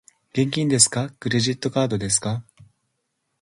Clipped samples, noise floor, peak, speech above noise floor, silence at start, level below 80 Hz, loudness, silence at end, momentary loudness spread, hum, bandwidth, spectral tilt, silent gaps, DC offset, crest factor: under 0.1%; -75 dBFS; -2 dBFS; 54 dB; 0.35 s; -56 dBFS; -21 LUFS; 1 s; 12 LU; none; 11.5 kHz; -3.5 dB/octave; none; under 0.1%; 22 dB